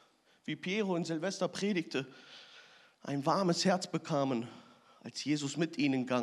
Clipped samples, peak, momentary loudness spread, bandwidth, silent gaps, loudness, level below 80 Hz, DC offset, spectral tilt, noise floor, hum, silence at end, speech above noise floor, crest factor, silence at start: under 0.1%; -16 dBFS; 18 LU; 12.5 kHz; none; -34 LUFS; under -90 dBFS; under 0.1%; -5 dB/octave; -59 dBFS; none; 0 s; 26 dB; 18 dB; 0.45 s